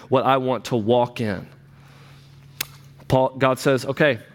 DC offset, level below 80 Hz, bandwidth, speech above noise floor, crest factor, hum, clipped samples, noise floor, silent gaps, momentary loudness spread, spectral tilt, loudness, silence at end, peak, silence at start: under 0.1%; -52 dBFS; 17.5 kHz; 27 dB; 18 dB; none; under 0.1%; -47 dBFS; none; 12 LU; -6 dB/octave; -21 LUFS; 0.1 s; -4 dBFS; 0 s